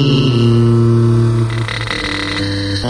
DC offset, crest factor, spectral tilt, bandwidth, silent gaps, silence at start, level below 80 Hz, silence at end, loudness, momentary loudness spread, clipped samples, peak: under 0.1%; 12 dB; -6.5 dB/octave; 10.5 kHz; none; 0 s; -34 dBFS; 0 s; -14 LUFS; 7 LU; under 0.1%; 0 dBFS